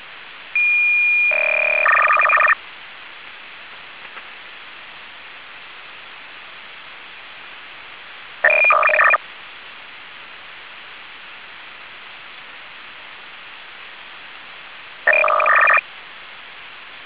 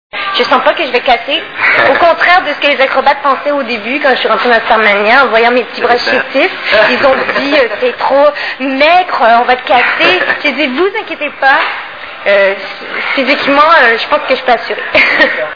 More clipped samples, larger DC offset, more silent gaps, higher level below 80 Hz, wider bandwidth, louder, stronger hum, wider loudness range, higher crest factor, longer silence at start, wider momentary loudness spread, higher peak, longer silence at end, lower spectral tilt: second, under 0.1% vs 1%; about the same, 0.4% vs 0.6%; neither; second, -70 dBFS vs -46 dBFS; second, 4 kHz vs 5.4 kHz; second, -14 LUFS vs -9 LUFS; neither; first, 20 LU vs 2 LU; first, 18 dB vs 10 dB; second, 0 s vs 0.15 s; first, 23 LU vs 7 LU; second, -4 dBFS vs 0 dBFS; about the same, 0 s vs 0 s; about the same, -3.5 dB/octave vs -4 dB/octave